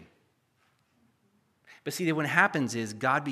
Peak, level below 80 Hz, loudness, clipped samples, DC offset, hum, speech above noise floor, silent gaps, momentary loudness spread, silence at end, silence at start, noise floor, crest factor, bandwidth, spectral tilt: -6 dBFS; -80 dBFS; -27 LUFS; under 0.1%; under 0.1%; none; 43 dB; none; 11 LU; 0 s; 0 s; -71 dBFS; 26 dB; 15 kHz; -4.5 dB/octave